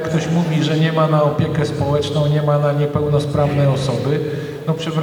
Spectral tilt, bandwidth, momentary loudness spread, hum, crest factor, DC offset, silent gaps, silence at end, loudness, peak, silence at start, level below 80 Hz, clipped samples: -7 dB/octave; 11 kHz; 5 LU; none; 14 dB; under 0.1%; none; 0 s; -17 LUFS; -4 dBFS; 0 s; -44 dBFS; under 0.1%